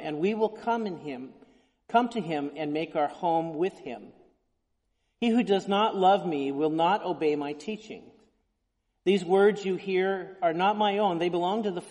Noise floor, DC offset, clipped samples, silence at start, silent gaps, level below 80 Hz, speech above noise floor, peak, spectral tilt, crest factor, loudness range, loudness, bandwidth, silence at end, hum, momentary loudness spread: -77 dBFS; under 0.1%; under 0.1%; 0 s; none; -72 dBFS; 51 dB; -10 dBFS; -6 dB/octave; 18 dB; 4 LU; -27 LUFS; 11 kHz; 0 s; none; 14 LU